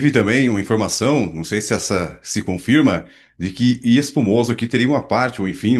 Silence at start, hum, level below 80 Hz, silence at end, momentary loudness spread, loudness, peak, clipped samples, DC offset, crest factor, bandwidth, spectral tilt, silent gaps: 0 s; none; -52 dBFS; 0 s; 8 LU; -18 LUFS; -2 dBFS; under 0.1%; under 0.1%; 16 dB; 12.5 kHz; -5 dB/octave; none